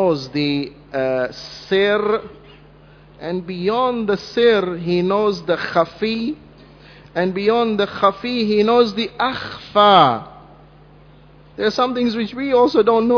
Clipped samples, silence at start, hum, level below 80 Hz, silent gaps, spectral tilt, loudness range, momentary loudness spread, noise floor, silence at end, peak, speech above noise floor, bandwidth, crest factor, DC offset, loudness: under 0.1%; 0 s; none; -52 dBFS; none; -6 dB/octave; 5 LU; 12 LU; -46 dBFS; 0 s; 0 dBFS; 28 dB; 5.4 kHz; 18 dB; under 0.1%; -18 LUFS